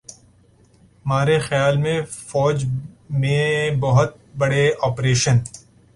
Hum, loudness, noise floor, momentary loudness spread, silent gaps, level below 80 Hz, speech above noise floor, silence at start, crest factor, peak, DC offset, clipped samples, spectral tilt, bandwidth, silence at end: none; -20 LUFS; -54 dBFS; 8 LU; none; -48 dBFS; 35 dB; 0.1 s; 16 dB; -4 dBFS; under 0.1%; under 0.1%; -5.5 dB/octave; 11.5 kHz; 0.35 s